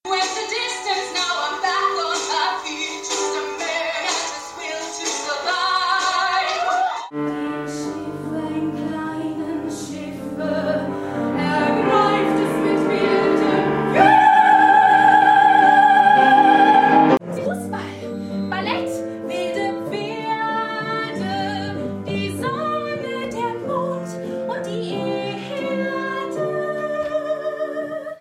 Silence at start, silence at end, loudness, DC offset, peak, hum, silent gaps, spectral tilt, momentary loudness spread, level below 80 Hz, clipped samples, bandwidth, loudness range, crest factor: 0.05 s; 0 s; -19 LUFS; under 0.1%; -2 dBFS; none; none; -4 dB/octave; 15 LU; -60 dBFS; under 0.1%; 13.5 kHz; 12 LU; 18 dB